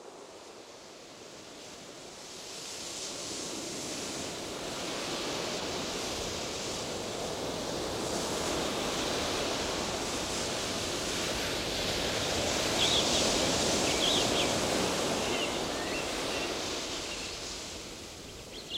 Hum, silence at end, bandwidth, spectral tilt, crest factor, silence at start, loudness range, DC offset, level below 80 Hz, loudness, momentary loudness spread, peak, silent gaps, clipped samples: none; 0 s; 16.5 kHz; -2.5 dB/octave; 18 dB; 0 s; 11 LU; under 0.1%; -52 dBFS; -31 LUFS; 19 LU; -16 dBFS; none; under 0.1%